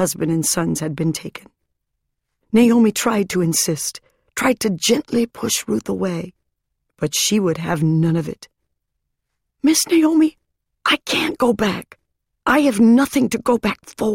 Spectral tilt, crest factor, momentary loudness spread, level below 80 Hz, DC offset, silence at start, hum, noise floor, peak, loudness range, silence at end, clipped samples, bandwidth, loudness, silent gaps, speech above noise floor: -4 dB/octave; 16 dB; 10 LU; -52 dBFS; under 0.1%; 0 s; none; -76 dBFS; -2 dBFS; 4 LU; 0 s; under 0.1%; 16.5 kHz; -18 LUFS; none; 58 dB